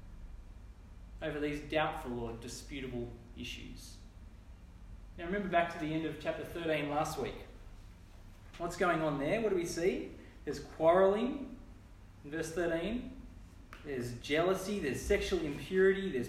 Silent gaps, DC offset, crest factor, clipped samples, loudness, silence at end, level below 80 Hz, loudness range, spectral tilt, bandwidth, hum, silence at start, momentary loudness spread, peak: none; under 0.1%; 20 dB; under 0.1%; -35 LUFS; 0 s; -52 dBFS; 7 LU; -5.5 dB/octave; 15 kHz; none; 0 s; 25 LU; -16 dBFS